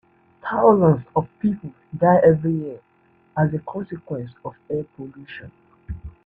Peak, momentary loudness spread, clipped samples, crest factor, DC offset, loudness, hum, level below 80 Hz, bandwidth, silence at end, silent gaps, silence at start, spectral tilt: -2 dBFS; 23 LU; under 0.1%; 18 dB; under 0.1%; -21 LUFS; none; -50 dBFS; 3.8 kHz; 0.15 s; none; 0.45 s; -11 dB/octave